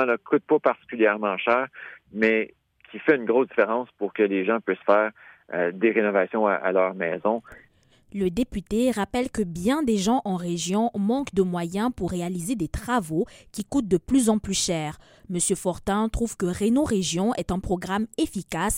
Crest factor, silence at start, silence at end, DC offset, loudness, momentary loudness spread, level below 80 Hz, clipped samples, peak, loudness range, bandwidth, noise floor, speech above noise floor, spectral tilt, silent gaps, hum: 18 dB; 0 s; 0 s; under 0.1%; -24 LUFS; 7 LU; -46 dBFS; under 0.1%; -6 dBFS; 3 LU; 16.5 kHz; -59 dBFS; 35 dB; -5 dB/octave; none; none